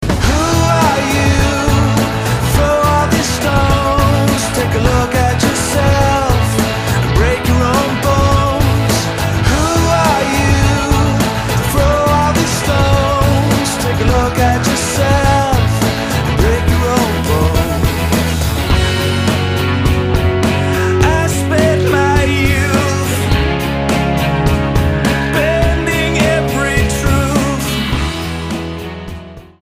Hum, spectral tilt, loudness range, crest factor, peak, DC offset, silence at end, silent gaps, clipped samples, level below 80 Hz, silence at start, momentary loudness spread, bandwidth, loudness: none; -5 dB/octave; 1 LU; 12 dB; 0 dBFS; under 0.1%; 0.2 s; none; under 0.1%; -22 dBFS; 0 s; 3 LU; 15.5 kHz; -13 LUFS